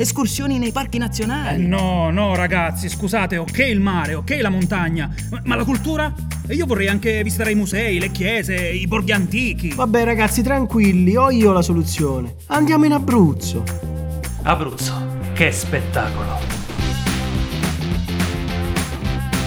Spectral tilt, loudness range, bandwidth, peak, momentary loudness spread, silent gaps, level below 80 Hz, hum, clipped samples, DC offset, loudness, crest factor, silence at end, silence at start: -5.5 dB/octave; 5 LU; 18.5 kHz; 0 dBFS; 9 LU; none; -30 dBFS; none; under 0.1%; under 0.1%; -19 LUFS; 18 dB; 0 s; 0 s